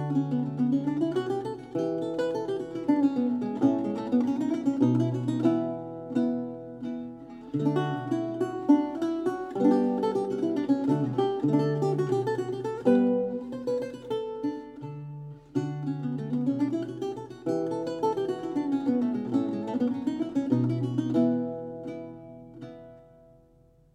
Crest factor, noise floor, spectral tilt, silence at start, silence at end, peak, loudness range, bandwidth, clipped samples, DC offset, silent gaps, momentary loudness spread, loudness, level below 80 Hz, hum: 18 dB; -59 dBFS; -8.5 dB/octave; 0 s; 0.9 s; -8 dBFS; 5 LU; 10.5 kHz; under 0.1%; under 0.1%; none; 13 LU; -28 LUFS; -66 dBFS; none